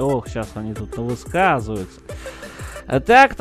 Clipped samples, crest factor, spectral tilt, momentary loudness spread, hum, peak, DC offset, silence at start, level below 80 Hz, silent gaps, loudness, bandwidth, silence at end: under 0.1%; 20 dB; -5.5 dB/octave; 21 LU; none; 0 dBFS; under 0.1%; 0 s; -38 dBFS; none; -19 LUFS; 13 kHz; 0 s